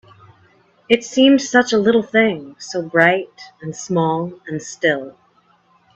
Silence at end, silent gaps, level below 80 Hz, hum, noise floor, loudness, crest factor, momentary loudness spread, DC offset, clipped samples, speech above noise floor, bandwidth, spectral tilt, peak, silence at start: 0.85 s; none; -60 dBFS; none; -57 dBFS; -17 LUFS; 18 dB; 17 LU; under 0.1%; under 0.1%; 40 dB; 8.2 kHz; -4.5 dB/octave; 0 dBFS; 0.9 s